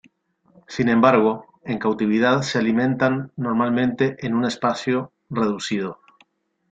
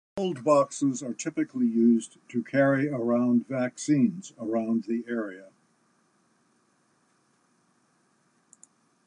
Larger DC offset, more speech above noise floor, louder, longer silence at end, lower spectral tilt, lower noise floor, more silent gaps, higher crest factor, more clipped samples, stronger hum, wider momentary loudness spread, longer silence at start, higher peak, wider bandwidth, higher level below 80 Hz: neither; about the same, 41 dB vs 42 dB; first, -21 LUFS vs -27 LUFS; second, 0.75 s vs 3.6 s; about the same, -6 dB/octave vs -6 dB/octave; second, -61 dBFS vs -68 dBFS; neither; about the same, 20 dB vs 18 dB; neither; neither; about the same, 10 LU vs 10 LU; first, 0.7 s vs 0.15 s; first, -2 dBFS vs -10 dBFS; second, 8 kHz vs 10 kHz; first, -60 dBFS vs -78 dBFS